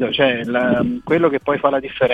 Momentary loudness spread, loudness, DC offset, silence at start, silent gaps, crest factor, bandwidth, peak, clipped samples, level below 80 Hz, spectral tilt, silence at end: 3 LU; -18 LUFS; under 0.1%; 0 s; none; 16 dB; 7.4 kHz; -2 dBFS; under 0.1%; -50 dBFS; -7.5 dB/octave; 0 s